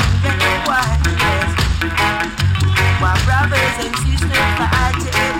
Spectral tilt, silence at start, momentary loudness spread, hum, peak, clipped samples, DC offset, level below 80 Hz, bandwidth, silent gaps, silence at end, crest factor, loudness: -4.5 dB/octave; 0 s; 3 LU; none; -4 dBFS; under 0.1%; under 0.1%; -24 dBFS; 16.5 kHz; none; 0 s; 12 dB; -15 LUFS